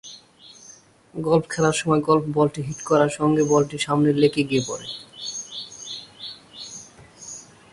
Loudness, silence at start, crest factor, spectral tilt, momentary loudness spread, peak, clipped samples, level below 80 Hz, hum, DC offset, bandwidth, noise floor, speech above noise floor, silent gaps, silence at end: -22 LUFS; 0.05 s; 20 dB; -5 dB/octave; 19 LU; -4 dBFS; under 0.1%; -58 dBFS; none; under 0.1%; 11.5 kHz; -49 dBFS; 29 dB; none; 0.3 s